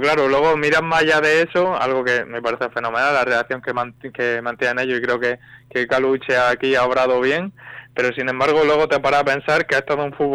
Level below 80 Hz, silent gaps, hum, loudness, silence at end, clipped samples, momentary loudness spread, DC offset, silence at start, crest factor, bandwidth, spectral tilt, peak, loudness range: -54 dBFS; none; none; -18 LUFS; 0 s; under 0.1%; 8 LU; under 0.1%; 0 s; 10 dB; 12.5 kHz; -4.5 dB/octave; -10 dBFS; 3 LU